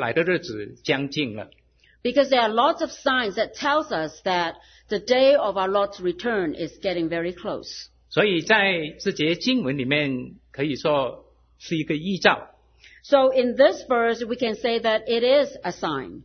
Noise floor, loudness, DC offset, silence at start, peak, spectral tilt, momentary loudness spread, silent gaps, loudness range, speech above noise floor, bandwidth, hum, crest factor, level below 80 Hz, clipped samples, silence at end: -53 dBFS; -23 LUFS; under 0.1%; 0 s; 0 dBFS; -5 dB/octave; 12 LU; none; 3 LU; 30 dB; 6.6 kHz; none; 22 dB; -58 dBFS; under 0.1%; 0.05 s